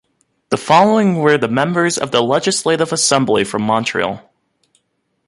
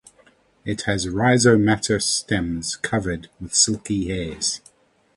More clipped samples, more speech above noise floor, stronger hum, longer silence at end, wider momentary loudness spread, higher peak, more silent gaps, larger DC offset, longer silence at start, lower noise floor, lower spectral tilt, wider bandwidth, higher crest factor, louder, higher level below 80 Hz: neither; first, 53 dB vs 36 dB; neither; first, 1.1 s vs 0.6 s; second, 9 LU vs 13 LU; about the same, 0 dBFS vs -2 dBFS; neither; neither; second, 0.5 s vs 0.65 s; first, -68 dBFS vs -57 dBFS; about the same, -4 dB/octave vs -3.5 dB/octave; about the same, 11.5 kHz vs 11.5 kHz; about the same, 16 dB vs 20 dB; first, -15 LUFS vs -21 LUFS; second, -56 dBFS vs -44 dBFS